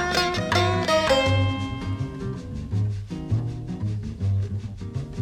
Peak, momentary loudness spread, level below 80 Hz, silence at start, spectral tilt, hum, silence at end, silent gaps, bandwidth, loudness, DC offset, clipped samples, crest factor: -8 dBFS; 13 LU; -42 dBFS; 0 s; -5.5 dB/octave; none; 0 s; none; 15 kHz; -25 LUFS; under 0.1%; under 0.1%; 18 dB